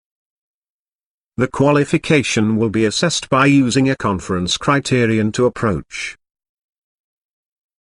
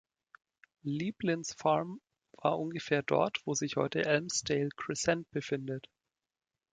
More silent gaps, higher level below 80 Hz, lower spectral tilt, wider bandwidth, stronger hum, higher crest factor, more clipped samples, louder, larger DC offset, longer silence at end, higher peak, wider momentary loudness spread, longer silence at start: neither; first, -48 dBFS vs -68 dBFS; about the same, -5 dB/octave vs -4 dB/octave; first, 11 kHz vs 9.6 kHz; neither; about the same, 18 dB vs 20 dB; neither; first, -16 LUFS vs -33 LUFS; neither; first, 1.7 s vs 0.9 s; first, 0 dBFS vs -14 dBFS; about the same, 9 LU vs 9 LU; first, 1.4 s vs 0.85 s